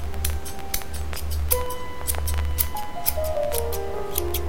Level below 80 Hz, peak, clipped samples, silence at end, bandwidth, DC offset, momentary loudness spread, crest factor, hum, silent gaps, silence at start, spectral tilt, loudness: -32 dBFS; -2 dBFS; under 0.1%; 0 s; 17 kHz; 4%; 6 LU; 24 dB; none; none; 0 s; -4 dB/octave; -27 LUFS